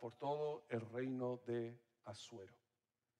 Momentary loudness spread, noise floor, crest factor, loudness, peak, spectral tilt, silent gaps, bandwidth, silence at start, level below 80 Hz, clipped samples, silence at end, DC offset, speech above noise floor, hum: 15 LU; under -90 dBFS; 16 dB; -46 LUFS; -30 dBFS; -6.5 dB/octave; none; 11 kHz; 0 s; under -90 dBFS; under 0.1%; 0.65 s; under 0.1%; over 45 dB; none